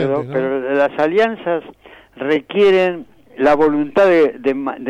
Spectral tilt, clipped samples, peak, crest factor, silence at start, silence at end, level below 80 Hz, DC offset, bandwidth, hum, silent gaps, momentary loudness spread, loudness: -7 dB/octave; under 0.1%; -6 dBFS; 10 dB; 0 s; 0 s; -52 dBFS; under 0.1%; 8.6 kHz; none; none; 9 LU; -16 LUFS